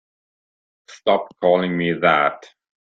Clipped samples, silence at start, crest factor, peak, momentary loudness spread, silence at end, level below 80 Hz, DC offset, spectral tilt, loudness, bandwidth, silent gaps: under 0.1%; 0.9 s; 18 dB; -2 dBFS; 7 LU; 0.4 s; -62 dBFS; under 0.1%; -6.5 dB/octave; -19 LUFS; 7.6 kHz; none